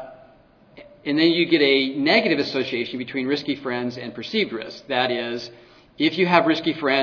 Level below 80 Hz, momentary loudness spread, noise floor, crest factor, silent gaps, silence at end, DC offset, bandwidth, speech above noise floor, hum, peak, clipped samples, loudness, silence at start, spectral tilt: -64 dBFS; 13 LU; -53 dBFS; 22 dB; none; 0 s; under 0.1%; 5.4 kHz; 31 dB; none; 0 dBFS; under 0.1%; -21 LUFS; 0 s; -6 dB/octave